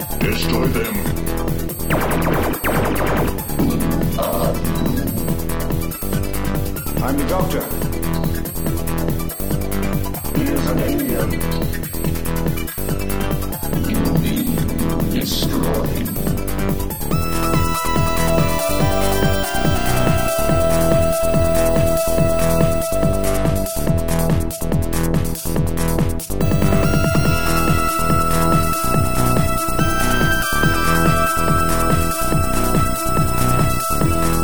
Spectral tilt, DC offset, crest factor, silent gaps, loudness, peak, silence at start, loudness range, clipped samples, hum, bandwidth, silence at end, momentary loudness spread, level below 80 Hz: -5.5 dB/octave; 5%; 16 dB; none; -19 LUFS; -2 dBFS; 0 s; 5 LU; under 0.1%; none; over 20 kHz; 0 s; 6 LU; -26 dBFS